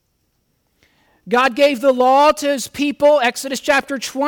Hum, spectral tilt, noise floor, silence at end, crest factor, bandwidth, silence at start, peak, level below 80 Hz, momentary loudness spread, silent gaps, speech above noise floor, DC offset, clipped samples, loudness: none; -2.5 dB/octave; -66 dBFS; 0 s; 12 dB; 18.5 kHz; 1.25 s; -4 dBFS; -56 dBFS; 8 LU; none; 51 dB; under 0.1%; under 0.1%; -16 LUFS